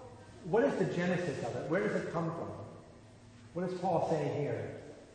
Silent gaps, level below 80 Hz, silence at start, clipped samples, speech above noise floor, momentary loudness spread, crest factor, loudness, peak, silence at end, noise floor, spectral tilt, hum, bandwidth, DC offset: none; -66 dBFS; 0 s; under 0.1%; 22 dB; 17 LU; 18 dB; -34 LUFS; -18 dBFS; 0 s; -55 dBFS; -7 dB/octave; none; 9.6 kHz; under 0.1%